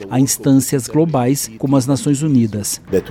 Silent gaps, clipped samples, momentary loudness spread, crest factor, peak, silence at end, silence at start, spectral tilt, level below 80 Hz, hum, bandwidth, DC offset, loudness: none; under 0.1%; 5 LU; 12 dB; -2 dBFS; 0 s; 0 s; -5.5 dB/octave; -48 dBFS; none; 16.5 kHz; under 0.1%; -16 LUFS